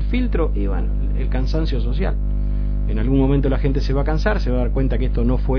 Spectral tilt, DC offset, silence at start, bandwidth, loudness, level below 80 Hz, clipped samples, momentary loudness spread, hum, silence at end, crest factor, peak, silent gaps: -9 dB/octave; under 0.1%; 0 s; 5.4 kHz; -21 LUFS; -20 dBFS; under 0.1%; 5 LU; 50 Hz at -20 dBFS; 0 s; 12 dB; -6 dBFS; none